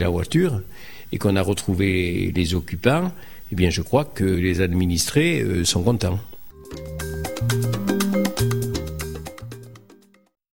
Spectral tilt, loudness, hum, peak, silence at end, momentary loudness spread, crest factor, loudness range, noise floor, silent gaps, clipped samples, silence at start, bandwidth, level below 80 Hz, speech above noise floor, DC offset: -5.5 dB/octave; -22 LUFS; none; -4 dBFS; 0.05 s; 15 LU; 18 dB; 4 LU; -53 dBFS; none; under 0.1%; 0 s; 17 kHz; -38 dBFS; 32 dB; 1%